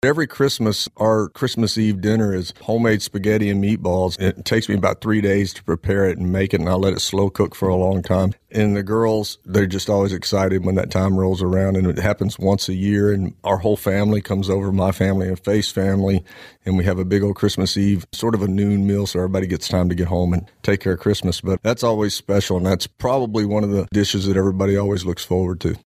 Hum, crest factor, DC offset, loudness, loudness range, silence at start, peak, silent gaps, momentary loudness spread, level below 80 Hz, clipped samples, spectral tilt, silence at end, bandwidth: none; 16 dB; under 0.1%; -19 LUFS; 1 LU; 0.05 s; -2 dBFS; none; 3 LU; -42 dBFS; under 0.1%; -6 dB/octave; 0.05 s; 15.5 kHz